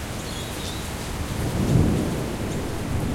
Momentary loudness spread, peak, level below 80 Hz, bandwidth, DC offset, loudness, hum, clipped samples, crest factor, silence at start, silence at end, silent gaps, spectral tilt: 10 LU; -6 dBFS; -34 dBFS; 16.5 kHz; under 0.1%; -26 LUFS; none; under 0.1%; 18 dB; 0 s; 0 s; none; -5.5 dB/octave